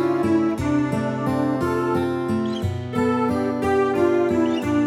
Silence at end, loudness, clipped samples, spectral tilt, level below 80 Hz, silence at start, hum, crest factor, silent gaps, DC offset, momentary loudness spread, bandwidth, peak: 0 s; -22 LUFS; under 0.1%; -7.5 dB/octave; -48 dBFS; 0 s; none; 12 dB; none; under 0.1%; 4 LU; 14 kHz; -8 dBFS